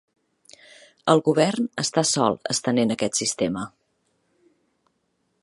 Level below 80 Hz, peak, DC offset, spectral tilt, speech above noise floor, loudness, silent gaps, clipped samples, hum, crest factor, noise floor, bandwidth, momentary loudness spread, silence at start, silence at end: -64 dBFS; -2 dBFS; under 0.1%; -4 dB/octave; 50 dB; -22 LUFS; none; under 0.1%; none; 24 dB; -72 dBFS; 11.5 kHz; 8 LU; 1.05 s; 1.75 s